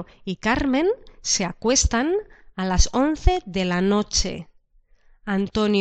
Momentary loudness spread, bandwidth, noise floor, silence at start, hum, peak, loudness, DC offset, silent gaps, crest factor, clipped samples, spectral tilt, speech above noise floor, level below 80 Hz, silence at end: 10 LU; 9.2 kHz; -57 dBFS; 0 s; none; -2 dBFS; -22 LUFS; under 0.1%; none; 20 dB; under 0.1%; -4 dB/octave; 35 dB; -30 dBFS; 0 s